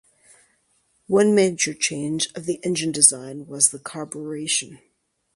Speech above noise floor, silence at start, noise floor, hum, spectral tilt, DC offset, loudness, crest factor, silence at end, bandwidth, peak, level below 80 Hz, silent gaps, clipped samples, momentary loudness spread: 44 dB; 1.1 s; -66 dBFS; none; -2.5 dB/octave; under 0.1%; -20 LUFS; 24 dB; 0.6 s; 12 kHz; 0 dBFS; -66 dBFS; none; under 0.1%; 17 LU